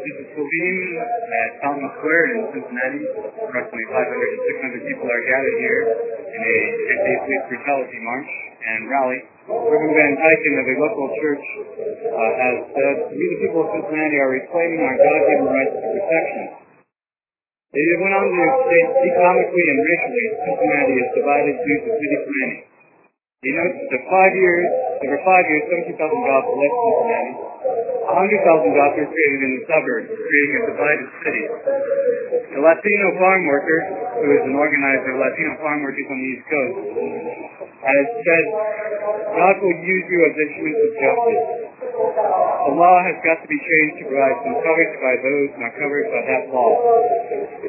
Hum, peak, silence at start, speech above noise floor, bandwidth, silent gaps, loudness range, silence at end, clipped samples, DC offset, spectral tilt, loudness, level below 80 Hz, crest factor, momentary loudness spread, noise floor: none; 0 dBFS; 0 s; over 72 dB; 2.9 kHz; none; 4 LU; 0 s; under 0.1%; under 0.1%; -10.5 dB/octave; -18 LUFS; -66 dBFS; 18 dB; 11 LU; under -90 dBFS